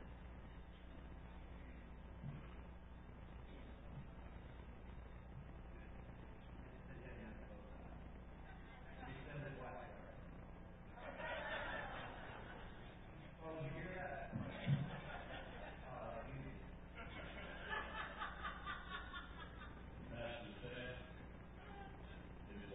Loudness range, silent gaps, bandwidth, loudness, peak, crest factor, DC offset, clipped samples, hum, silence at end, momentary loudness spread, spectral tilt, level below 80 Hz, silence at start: 9 LU; none; 3.9 kHz; -52 LUFS; -28 dBFS; 24 dB; under 0.1%; under 0.1%; none; 0 s; 11 LU; -3.5 dB/octave; -58 dBFS; 0 s